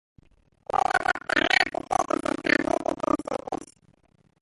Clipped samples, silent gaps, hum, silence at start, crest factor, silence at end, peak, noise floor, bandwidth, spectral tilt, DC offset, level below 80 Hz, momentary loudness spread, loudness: under 0.1%; none; none; 0.75 s; 22 dB; 0.8 s; -6 dBFS; -62 dBFS; 11.5 kHz; -3 dB/octave; under 0.1%; -56 dBFS; 11 LU; -25 LUFS